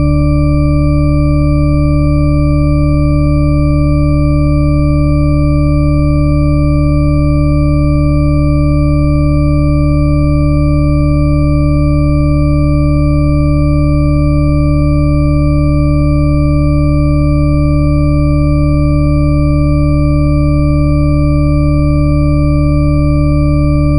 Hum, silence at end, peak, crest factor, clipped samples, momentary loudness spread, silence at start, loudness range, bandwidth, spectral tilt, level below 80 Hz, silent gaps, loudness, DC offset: none; 0 s; 0 dBFS; 8 dB; under 0.1%; 0 LU; 0 s; 0 LU; 10 kHz; -9.5 dB/octave; -14 dBFS; none; -11 LUFS; under 0.1%